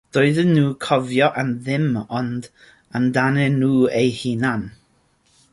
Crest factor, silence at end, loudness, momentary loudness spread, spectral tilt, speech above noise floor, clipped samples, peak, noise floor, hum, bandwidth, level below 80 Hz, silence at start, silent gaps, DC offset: 16 dB; 0.85 s; -19 LUFS; 10 LU; -7 dB/octave; 42 dB; under 0.1%; -4 dBFS; -61 dBFS; none; 11.5 kHz; -56 dBFS; 0.15 s; none; under 0.1%